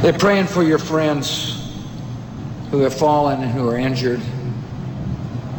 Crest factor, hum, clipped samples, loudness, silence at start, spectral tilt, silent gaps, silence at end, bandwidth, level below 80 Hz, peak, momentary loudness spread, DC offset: 14 dB; none; under 0.1%; -19 LUFS; 0 s; -6 dB/octave; none; 0 s; over 20 kHz; -42 dBFS; -4 dBFS; 14 LU; under 0.1%